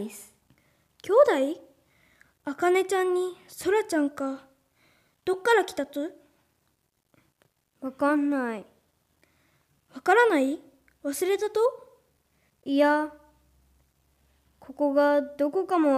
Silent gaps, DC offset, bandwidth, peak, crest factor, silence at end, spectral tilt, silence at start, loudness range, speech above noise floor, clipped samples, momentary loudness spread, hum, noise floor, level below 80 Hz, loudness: none; under 0.1%; 15.5 kHz; -8 dBFS; 20 dB; 0 s; -3.5 dB/octave; 0 s; 6 LU; 49 dB; under 0.1%; 18 LU; none; -73 dBFS; -72 dBFS; -26 LUFS